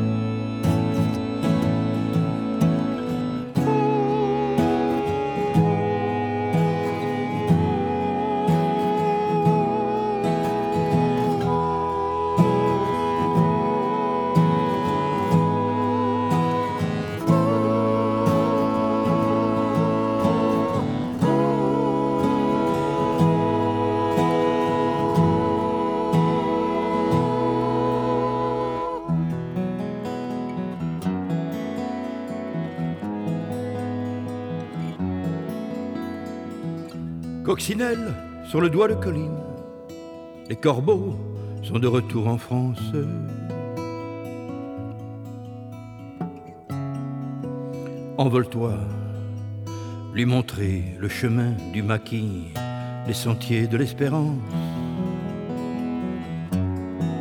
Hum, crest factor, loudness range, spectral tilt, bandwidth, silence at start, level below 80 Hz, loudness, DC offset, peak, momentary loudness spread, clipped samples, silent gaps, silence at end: none; 18 dB; 7 LU; -7.5 dB/octave; 17.5 kHz; 0 s; -54 dBFS; -24 LUFS; under 0.1%; -6 dBFS; 11 LU; under 0.1%; none; 0 s